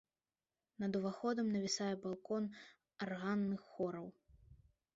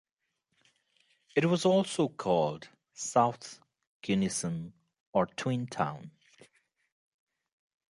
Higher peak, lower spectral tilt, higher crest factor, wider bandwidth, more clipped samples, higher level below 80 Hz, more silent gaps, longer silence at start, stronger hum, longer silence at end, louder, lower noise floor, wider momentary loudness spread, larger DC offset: second, -26 dBFS vs -10 dBFS; about the same, -5 dB/octave vs -5 dB/octave; second, 16 dB vs 22 dB; second, 7.6 kHz vs 11.5 kHz; neither; second, -76 dBFS vs -68 dBFS; second, none vs 3.87-4.01 s, 5.00-5.13 s; second, 0.8 s vs 1.35 s; neither; second, 0.4 s vs 1.8 s; second, -41 LUFS vs -30 LUFS; first, under -90 dBFS vs -82 dBFS; second, 11 LU vs 19 LU; neither